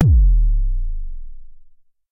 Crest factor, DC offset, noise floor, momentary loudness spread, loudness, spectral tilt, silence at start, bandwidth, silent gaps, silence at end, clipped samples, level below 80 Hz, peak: 14 dB; under 0.1%; -46 dBFS; 22 LU; -20 LUFS; -10.5 dB/octave; 0 s; 0.9 kHz; none; 0.5 s; under 0.1%; -18 dBFS; -2 dBFS